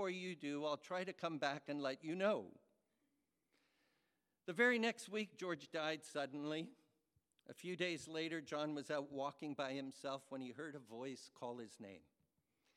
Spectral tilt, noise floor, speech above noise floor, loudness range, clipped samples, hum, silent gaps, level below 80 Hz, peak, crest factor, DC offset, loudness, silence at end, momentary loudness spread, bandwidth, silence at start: -4.5 dB/octave; -86 dBFS; 42 dB; 5 LU; under 0.1%; none; none; under -90 dBFS; -22 dBFS; 24 dB; under 0.1%; -44 LUFS; 0.75 s; 13 LU; 14.5 kHz; 0 s